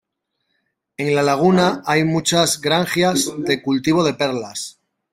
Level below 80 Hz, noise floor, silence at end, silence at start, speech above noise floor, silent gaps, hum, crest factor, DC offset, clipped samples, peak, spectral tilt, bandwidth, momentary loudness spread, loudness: -56 dBFS; -74 dBFS; 0.4 s; 1 s; 56 dB; none; none; 18 dB; under 0.1%; under 0.1%; -2 dBFS; -4 dB/octave; 16 kHz; 11 LU; -18 LUFS